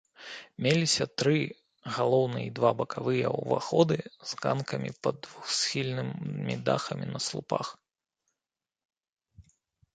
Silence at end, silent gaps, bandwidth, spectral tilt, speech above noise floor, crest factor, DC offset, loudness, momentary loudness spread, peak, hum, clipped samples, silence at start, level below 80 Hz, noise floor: 0.55 s; 8.85-8.89 s, 9.12-9.17 s; 9.4 kHz; -4.5 dB/octave; over 61 dB; 22 dB; under 0.1%; -29 LUFS; 11 LU; -8 dBFS; none; under 0.1%; 0.2 s; -68 dBFS; under -90 dBFS